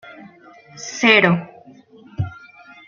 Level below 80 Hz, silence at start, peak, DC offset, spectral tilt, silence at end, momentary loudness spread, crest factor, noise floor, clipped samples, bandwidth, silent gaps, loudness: -56 dBFS; 0.05 s; 0 dBFS; under 0.1%; -4.5 dB/octave; 0.55 s; 24 LU; 22 dB; -46 dBFS; under 0.1%; 7.4 kHz; none; -17 LUFS